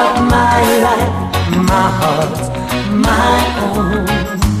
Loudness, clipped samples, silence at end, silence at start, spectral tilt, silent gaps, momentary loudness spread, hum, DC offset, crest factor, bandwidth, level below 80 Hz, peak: -13 LUFS; under 0.1%; 0 s; 0 s; -5.5 dB/octave; none; 6 LU; none; under 0.1%; 12 dB; 15.5 kHz; -24 dBFS; 0 dBFS